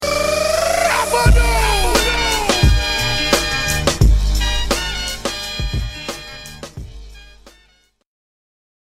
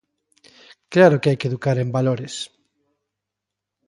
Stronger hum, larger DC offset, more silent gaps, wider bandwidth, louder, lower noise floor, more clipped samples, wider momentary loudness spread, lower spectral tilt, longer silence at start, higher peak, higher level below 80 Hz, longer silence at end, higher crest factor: second, none vs 50 Hz at -60 dBFS; neither; neither; first, 16 kHz vs 11.5 kHz; first, -16 LUFS vs -19 LUFS; second, -56 dBFS vs -84 dBFS; neither; about the same, 16 LU vs 16 LU; second, -3.5 dB/octave vs -6.5 dB/octave; second, 0 s vs 0.9 s; about the same, 0 dBFS vs -2 dBFS; first, -22 dBFS vs -62 dBFS; first, 1.7 s vs 1.4 s; about the same, 16 dB vs 20 dB